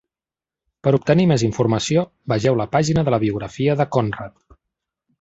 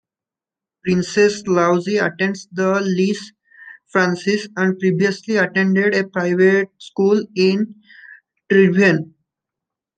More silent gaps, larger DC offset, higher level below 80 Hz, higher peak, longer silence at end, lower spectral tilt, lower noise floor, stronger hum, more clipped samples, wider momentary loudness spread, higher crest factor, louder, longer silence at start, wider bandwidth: neither; neither; first, -48 dBFS vs -62 dBFS; about the same, -2 dBFS vs -2 dBFS; about the same, 0.9 s vs 0.95 s; about the same, -6.5 dB/octave vs -6 dB/octave; about the same, under -90 dBFS vs -89 dBFS; neither; neither; about the same, 8 LU vs 7 LU; about the same, 18 dB vs 16 dB; about the same, -19 LUFS vs -17 LUFS; about the same, 0.85 s vs 0.85 s; second, 8 kHz vs 9 kHz